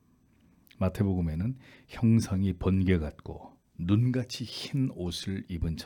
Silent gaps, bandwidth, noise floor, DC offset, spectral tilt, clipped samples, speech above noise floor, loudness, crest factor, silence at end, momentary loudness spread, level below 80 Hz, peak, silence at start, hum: none; 18 kHz; -64 dBFS; under 0.1%; -7 dB/octave; under 0.1%; 35 dB; -30 LUFS; 18 dB; 0 s; 19 LU; -48 dBFS; -12 dBFS; 0.8 s; none